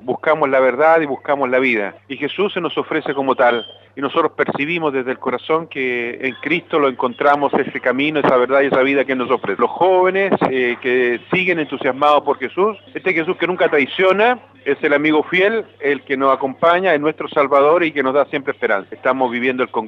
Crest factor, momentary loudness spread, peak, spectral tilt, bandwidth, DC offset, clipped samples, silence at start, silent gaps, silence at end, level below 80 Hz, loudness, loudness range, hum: 14 dB; 7 LU; -2 dBFS; -7 dB/octave; 6.4 kHz; under 0.1%; under 0.1%; 0.05 s; none; 0 s; -68 dBFS; -17 LUFS; 3 LU; none